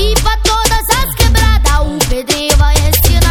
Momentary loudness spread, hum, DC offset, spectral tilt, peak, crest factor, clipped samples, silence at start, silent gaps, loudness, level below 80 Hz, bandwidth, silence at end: 4 LU; none; under 0.1%; -3.5 dB/octave; 0 dBFS; 10 dB; 0.4%; 0 s; none; -11 LUFS; -12 dBFS; 19.5 kHz; 0 s